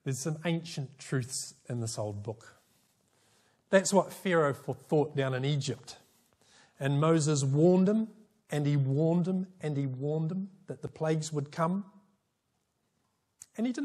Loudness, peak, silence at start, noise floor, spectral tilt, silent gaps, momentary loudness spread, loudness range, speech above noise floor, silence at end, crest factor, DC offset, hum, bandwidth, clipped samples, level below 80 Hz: -30 LUFS; -10 dBFS; 0.05 s; -79 dBFS; -6 dB/octave; none; 15 LU; 8 LU; 49 dB; 0 s; 22 dB; under 0.1%; none; 14 kHz; under 0.1%; -74 dBFS